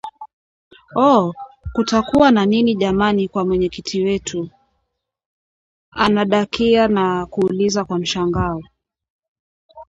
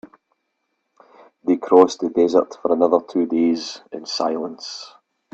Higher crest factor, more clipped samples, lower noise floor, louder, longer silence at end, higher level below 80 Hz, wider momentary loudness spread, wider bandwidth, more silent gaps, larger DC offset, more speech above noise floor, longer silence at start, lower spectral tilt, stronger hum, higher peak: about the same, 18 dB vs 20 dB; neither; about the same, -73 dBFS vs -74 dBFS; about the same, -17 LUFS vs -19 LUFS; second, 0.05 s vs 0.45 s; first, -42 dBFS vs -66 dBFS; second, 12 LU vs 17 LU; about the same, 8 kHz vs 8 kHz; first, 0.33-0.71 s, 5.26-5.92 s, 9.10-9.69 s vs none; neither; about the same, 57 dB vs 55 dB; second, 0.05 s vs 1.45 s; about the same, -5.5 dB/octave vs -5 dB/octave; neither; about the same, 0 dBFS vs 0 dBFS